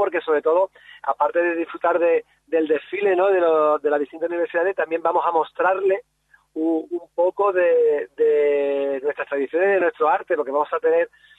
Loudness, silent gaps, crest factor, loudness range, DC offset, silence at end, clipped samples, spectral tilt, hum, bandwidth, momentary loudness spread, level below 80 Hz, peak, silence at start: -21 LUFS; none; 14 dB; 2 LU; under 0.1%; 0.3 s; under 0.1%; -6.5 dB/octave; none; 4 kHz; 8 LU; -74 dBFS; -6 dBFS; 0 s